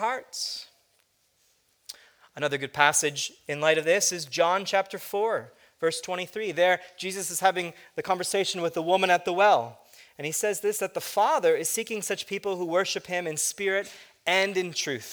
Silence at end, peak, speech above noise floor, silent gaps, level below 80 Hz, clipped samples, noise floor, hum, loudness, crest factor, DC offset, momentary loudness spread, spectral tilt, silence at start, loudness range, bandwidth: 0 s; -4 dBFS; 42 dB; none; -76 dBFS; under 0.1%; -69 dBFS; none; -26 LUFS; 24 dB; under 0.1%; 11 LU; -2 dB/octave; 0 s; 3 LU; over 20 kHz